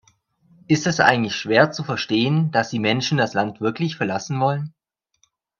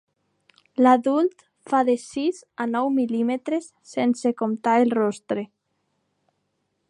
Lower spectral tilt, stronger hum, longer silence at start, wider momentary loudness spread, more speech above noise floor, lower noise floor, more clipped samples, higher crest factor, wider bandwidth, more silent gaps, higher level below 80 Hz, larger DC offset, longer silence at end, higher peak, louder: about the same, -5 dB/octave vs -5.5 dB/octave; neither; about the same, 0.7 s vs 0.8 s; second, 7 LU vs 11 LU; second, 46 dB vs 52 dB; second, -67 dBFS vs -74 dBFS; neither; about the same, 22 dB vs 18 dB; second, 7.4 kHz vs 11 kHz; neither; first, -62 dBFS vs -74 dBFS; neither; second, 0.9 s vs 1.45 s; first, 0 dBFS vs -6 dBFS; first, -20 LUFS vs -23 LUFS